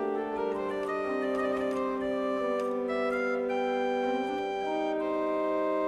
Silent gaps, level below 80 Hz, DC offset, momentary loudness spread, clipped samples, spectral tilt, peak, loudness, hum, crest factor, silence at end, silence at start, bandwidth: none; -64 dBFS; under 0.1%; 3 LU; under 0.1%; -5.5 dB/octave; -18 dBFS; -30 LUFS; none; 12 dB; 0 s; 0 s; 11.5 kHz